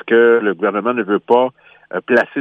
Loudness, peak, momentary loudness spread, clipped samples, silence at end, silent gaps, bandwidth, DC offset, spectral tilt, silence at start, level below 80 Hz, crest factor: -15 LUFS; -2 dBFS; 10 LU; under 0.1%; 0 s; none; 5.6 kHz; under 0.1%; -7 dB/octave; 0.05 s; -70 dBFS; 14 dB